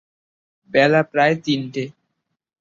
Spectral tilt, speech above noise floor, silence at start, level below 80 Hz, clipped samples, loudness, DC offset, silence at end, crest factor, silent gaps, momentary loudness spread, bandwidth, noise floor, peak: -6 dB/octave; 57 dB; 0.75 s; -62 dBFS; under 0.1%; -19 LUFS; under 0.1%; 0.7 s; 20 dB; none; 13 LU; 7.6 kHz; -75 dBFS; -2 dBFS